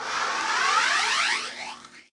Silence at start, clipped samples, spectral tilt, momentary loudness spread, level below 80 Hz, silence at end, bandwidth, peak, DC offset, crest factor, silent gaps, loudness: 0 s; under 0.1%; 1.5 dB/octave; 16 LU; -72 dBFS; 0.15 s; 11.5 kHz; -12 dBFS; under 0.1%; 14 dB; none; -23 LUFS